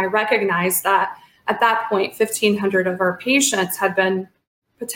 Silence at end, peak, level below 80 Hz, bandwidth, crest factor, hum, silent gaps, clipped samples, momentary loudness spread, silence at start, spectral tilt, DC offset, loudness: 0 s; -2 dBFS; -66 dBFS; 17 kHz; 18 dB; none; 4.47-4.62 s; under 0.1%; 9 LU; 0 s; -3 dB/octave; under 0.1%; -19 LUFS